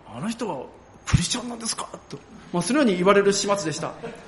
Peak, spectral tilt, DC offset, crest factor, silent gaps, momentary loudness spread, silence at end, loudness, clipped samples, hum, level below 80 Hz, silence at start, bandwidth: -4 dBFS; -4.5 dB/octave; under 0.1%; 20 dB; none; 20 LU; 0 s; -23 LUFS; under 0.1%; none; -42 dBFS; 0.05 s; 11.5 kHz